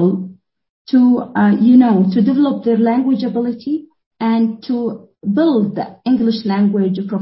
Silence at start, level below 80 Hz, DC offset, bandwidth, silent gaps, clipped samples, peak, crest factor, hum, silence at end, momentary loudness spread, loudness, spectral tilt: 0 s; -62 dBFS; under 0.1%; 5.8 kHz; 0.70-0.85 s, 4.06-4.11 s; under 0.1%; -2 dBFS; 14 dB; none; 0 s; 12 LU; -15 LUFS; -12.5 dB/octave